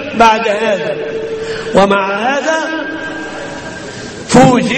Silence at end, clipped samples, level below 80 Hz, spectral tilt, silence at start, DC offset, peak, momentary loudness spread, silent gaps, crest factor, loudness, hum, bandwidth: 0 s; 0.4%; -42 dBFS; -5 dB/octave; 0 s; under 0.1%; 0 dBFS; 16 LU; none; 14 dB; -13 LUFS; none; 11.5 kHz